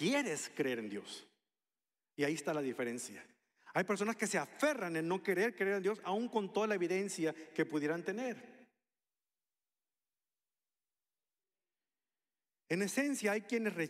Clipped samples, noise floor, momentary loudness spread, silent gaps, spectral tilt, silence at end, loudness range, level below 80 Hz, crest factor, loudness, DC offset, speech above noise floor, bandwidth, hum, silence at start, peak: under 0.1%; under -90 dBFS; 9 LU; none; -4.5 dB/octave; 0 s; 8 LU; under -90 dBFS; 20 dB; -37 LUFS; under 0.1%; over 53 dB; 16 kHz; none; 0 s; -18 dBFS